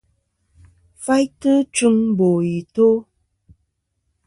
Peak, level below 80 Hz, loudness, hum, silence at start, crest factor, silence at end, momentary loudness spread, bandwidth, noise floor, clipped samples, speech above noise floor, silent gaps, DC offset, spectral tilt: -6 dBFS; -58 dBFS; -18 LUFS; none; 1 s; 14 dB; 1.25 s; 6 LU; 11.5 kHz; -72 dBFS; under 0.1%; 55 dB; none; under 0.1%; -6 dB/octave